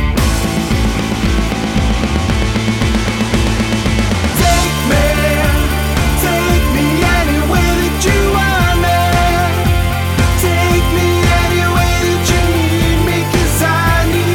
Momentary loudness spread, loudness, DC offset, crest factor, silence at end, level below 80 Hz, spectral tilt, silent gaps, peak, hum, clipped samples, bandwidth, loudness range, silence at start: 3 LU; -13 LUFS; under 0.1%; 12 dB; 0 s; -18 dBFS; -5 dB/octave; none; 0 dBFS; none; under 0.1%; 18.5 kHz; 2 LU; 0 s